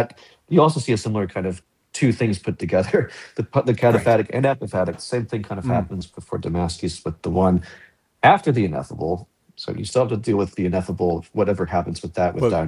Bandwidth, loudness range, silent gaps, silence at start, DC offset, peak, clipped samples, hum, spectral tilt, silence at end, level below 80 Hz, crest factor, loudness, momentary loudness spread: 12 kHz; 3 LU; none; 0 s; under 0.1%; -2 dBFS; under 0.1%; none; -6.5 dB/octave; 0 s; -42 dBFS; 20 dB; -22 LUFS; 12 LU